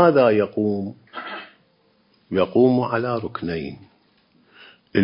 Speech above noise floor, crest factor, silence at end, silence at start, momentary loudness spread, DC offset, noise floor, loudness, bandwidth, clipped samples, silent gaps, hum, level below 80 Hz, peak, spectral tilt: 41 dB; 20 dB; 0 s; 0 s; 17 LU; under 0.1%; -61 dBFS; -21 LUFS; 5.4 kHz; under 0.1%; none; none; -54 dBFS; -2 dBFS; -11.5 dB/octave